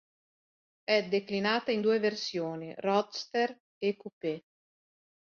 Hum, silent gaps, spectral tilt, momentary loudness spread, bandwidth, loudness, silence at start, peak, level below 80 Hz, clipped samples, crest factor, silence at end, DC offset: none; 3.60-3.81 s, 4.13-4.21 s; -5 dB/octave; 9 LU; 7.2 kHz; -31 LUFS; 0.9 s; -14 dBFS; -78 dBFS; under 0.1%; 18 dB; 0.9 s; under 0.1%